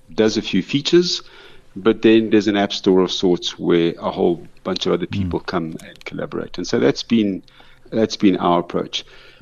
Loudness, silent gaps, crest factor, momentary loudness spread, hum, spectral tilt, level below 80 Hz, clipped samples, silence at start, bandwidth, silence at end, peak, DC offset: -19 LUFS; none; 16 dB; 12 LU; none; -5.5 dB/octave; -48 dBFS; under 0.1%; 0.1 s; 7.6 kHz; 0.4 s; -2 dBFS; under 0.1%